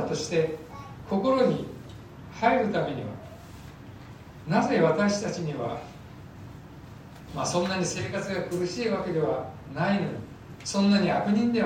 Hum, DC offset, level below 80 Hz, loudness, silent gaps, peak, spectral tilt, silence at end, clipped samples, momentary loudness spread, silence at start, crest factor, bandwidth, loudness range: none; under 0.1%; -56 dBFS; -27 LUFS; none; -10 dBFS; -5.5 dB/octave; 0 s; under 0.1%; 22 LU; 0 s; 18 dB; 15 kHz; 4 LU